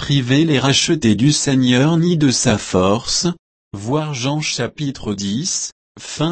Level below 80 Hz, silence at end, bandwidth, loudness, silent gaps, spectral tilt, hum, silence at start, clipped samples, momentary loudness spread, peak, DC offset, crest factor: -44 dBFS; 0 s; 8.8 kHz; -16 LUFS; 3.39-3.71 s, 5.72-5.95 s; -4.5 dB/octave; none; 0 s; under 0.1%; 11 LU; -2 dBFS; under 0.1%; 14 dB